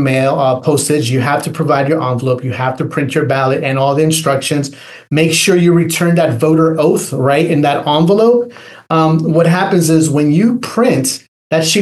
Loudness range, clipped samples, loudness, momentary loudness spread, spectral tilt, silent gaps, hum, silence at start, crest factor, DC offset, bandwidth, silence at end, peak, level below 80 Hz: 3 LU; under 0.1%; -12 LUFS; 6 LU; -5.5 dB/octave; 11.28-11.50 s; none; 0 s; 12 dB; under 0.1%; 12.5 kHz; 0 s; 0 dBFS; -58 dBFS